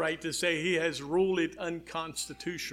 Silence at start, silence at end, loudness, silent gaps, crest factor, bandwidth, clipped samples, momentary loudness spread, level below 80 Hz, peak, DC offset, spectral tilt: 0 s; 0 s; -31 LUFS; none; 16 dB; 16 kHz; under 0.1%; 9 LU; -62 dBFS; -16 dBFS; under 0.1%; -3.5 dB/octave